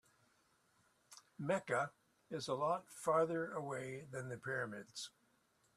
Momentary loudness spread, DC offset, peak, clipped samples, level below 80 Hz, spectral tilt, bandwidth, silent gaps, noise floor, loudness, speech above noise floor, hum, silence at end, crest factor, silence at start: 14 LU; under 0.1%; -22 dBFS; under 0.1%; -82 dBFS; -5 dB/octave; 14 kHz; none; -77 dBFS; -41 LUFS; 36 dB; none; 0.7 s; 20 dB; 1.1 s